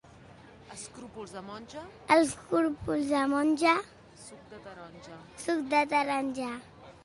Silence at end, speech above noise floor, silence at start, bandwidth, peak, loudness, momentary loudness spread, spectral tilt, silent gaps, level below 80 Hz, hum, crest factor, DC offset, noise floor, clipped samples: 0.15 s; 23 dB; 0.7 s; 11.5 kHz; -8 dBFS; -28 LUFS; 23 LU; -4 dB/octave; none; -62 dBFS; none; 24 dB; under 0.1%; -53 dBFS; under 0.1%